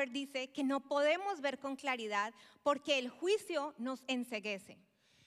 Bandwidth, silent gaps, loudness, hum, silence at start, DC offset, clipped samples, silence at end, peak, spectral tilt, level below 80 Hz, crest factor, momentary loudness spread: 14.5 kHz; none; -37 LUFS; none; 0 s; under 0.1%; under 0.1%; 0.55 s; -20 dBFS; -3 dB/octave; -88 dBFS; 18 dB; 8 LU